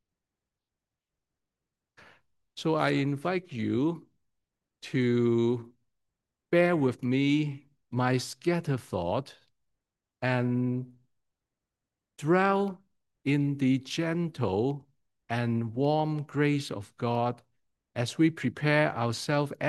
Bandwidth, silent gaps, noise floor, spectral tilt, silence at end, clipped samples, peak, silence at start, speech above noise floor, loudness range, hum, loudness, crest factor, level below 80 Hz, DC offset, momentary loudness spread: 12.5 kHz; none; -89 dBFS; -6.5 dB/octave; 0 s; under 0.1%; -10 dBFS; 2.55 s; 62 dB; 4 LU; none; -29 LUFS; 20 dB; -74 dBFS; under 0.1%; 11 LU